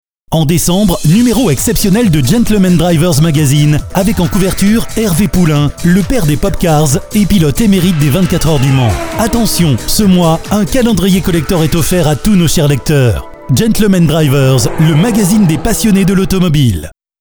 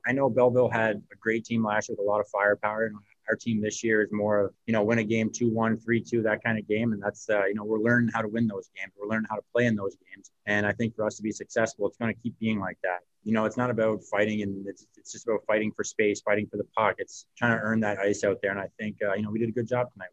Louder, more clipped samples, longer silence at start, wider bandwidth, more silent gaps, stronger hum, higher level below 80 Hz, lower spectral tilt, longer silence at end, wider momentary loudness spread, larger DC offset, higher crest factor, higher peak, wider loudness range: first, -10 LUFS vs -28 LUFS; neither; first, 0.3 s vs 0.05 s; first, over 20 kHz vs 8.4 kHz; neither; neither; first, -24 dBFS vs -64 dBFS; about the same, -5.5 dB/octave vs -6 dB/octave; first, 0.3 s vs 0.05 s; second, 3 LU vs 8 LU; first, 0.6% vs under 0.1%; second, 10 dB vs 20 dB; first, 0 dBFS vs -8 dBFS; about the same, 1 LU vs 3 LU